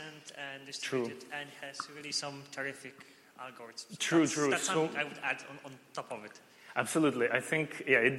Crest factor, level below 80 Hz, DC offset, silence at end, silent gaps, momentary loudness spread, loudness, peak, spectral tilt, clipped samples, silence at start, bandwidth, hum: 22 dB; -80 dBFS; under 0.1%; 0 s; none; 19 LU; -33 LUFS; -12 dBFS; -3.5 dB/octave; under 0.1%; 0 s; 15.5 kHz; none